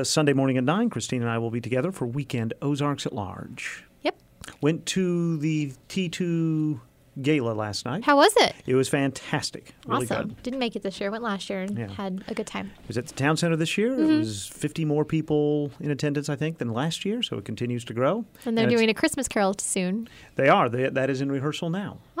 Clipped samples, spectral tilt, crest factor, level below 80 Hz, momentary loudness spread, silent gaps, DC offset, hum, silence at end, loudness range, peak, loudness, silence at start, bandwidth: under 0.1%; -5 dB/octave; 18 dB; -60 dBFS; 11 LU; none; under 0.1%; none; 0 s; 6 LU; -8 dBFS; -26 LUFS; 0 s; 16 kHz